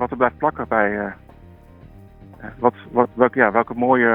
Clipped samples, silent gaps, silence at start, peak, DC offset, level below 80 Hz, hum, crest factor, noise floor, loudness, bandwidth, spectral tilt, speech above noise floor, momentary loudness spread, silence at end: under 0.1%; none; 0 s; 0 dBFS; under 0.1%; -48 dBFS; none; 20 dB; -45 dBFS; -19 LUFS; 3.9 kHz; -9.5 dB/octave; 26 dB; 12 LU; 0 s